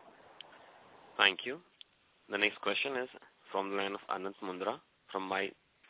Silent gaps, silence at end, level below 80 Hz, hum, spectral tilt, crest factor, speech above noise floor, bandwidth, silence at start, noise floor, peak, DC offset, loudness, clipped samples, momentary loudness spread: none; 0.35 s; -82 dBFS; none; 0.5 dB/octave; 28 dB; 26 dB; 4 kHz; 0.05 s; -62 dBFS; -10 dBFS; under 0.1%; -35 LUFS; under 0.1%; 19 LU